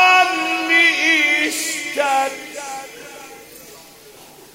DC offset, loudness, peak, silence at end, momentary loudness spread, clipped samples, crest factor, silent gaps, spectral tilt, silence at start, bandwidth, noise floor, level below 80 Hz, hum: under 0.1%; -15 LUFS; 0 dBFS; 0.3 s; 23 LU; under 0.1%; 18 dB; none; 0 dB/octave; 0 s; 16 kHz; -43 dBFS; -66 dBFS; none